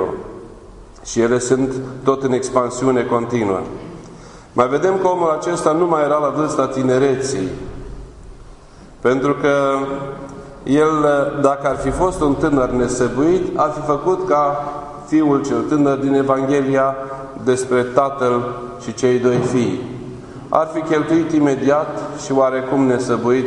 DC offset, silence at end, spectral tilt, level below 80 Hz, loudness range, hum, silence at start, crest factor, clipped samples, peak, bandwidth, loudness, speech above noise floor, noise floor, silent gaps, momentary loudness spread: under 0.1%; 0 s; -6 dB/octave; -42 dBFS; 3 LU; none; 0 s; 18 dB; under 0.1%; 0 dBFS; 11 kHz; -17 LUFS; 24 dB; -40 dBFS; none; 14 LU